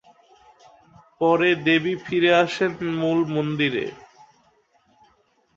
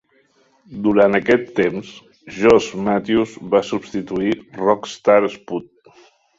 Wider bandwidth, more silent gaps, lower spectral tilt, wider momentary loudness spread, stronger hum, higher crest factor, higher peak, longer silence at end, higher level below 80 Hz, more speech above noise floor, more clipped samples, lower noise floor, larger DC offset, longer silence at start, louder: about the same, 7.6 kHz vs 7.8 kHz; neither; about the same, -6 dB/octave vs -6 dB/octave; second, 7 LU vs 15 LU; neither; about the same, 18 dB vs 18 dB; second, -6 dBFS vs 0 dBFS; first, 1.55 s vs 0.75 s; second, -64 dBFS vs -52 dBFS; about the same, 42 dB vs 41 dB; neither; first, -63 dBFS vs -59 dBFS; neither; first, 1.2 s vs 0.7 s; second, -21 LUFS vs -18 LUFS